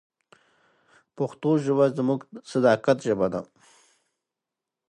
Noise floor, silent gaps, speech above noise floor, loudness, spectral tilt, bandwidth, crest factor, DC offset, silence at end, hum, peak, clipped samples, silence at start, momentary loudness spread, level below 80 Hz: -87 dBFS; none; 64 dB; -24 LUFS; -7 dB/octave; 11 kHz; 20 dB; under 0.1%; 1.45 s; none; -6 dBFS; under 0.1%; 1.2 s; 10 LU; -66 dBFS